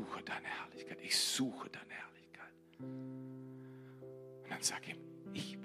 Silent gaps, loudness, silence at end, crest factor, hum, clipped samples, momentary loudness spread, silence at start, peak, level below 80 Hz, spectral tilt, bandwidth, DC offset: none; -41 LUFS; 0 s; 24 dB; none; under 0.1%; 20 LU; 0 s; -20 dBFS; -84 dBFS; -2 dB/octave; 15 kHz; under 0.1%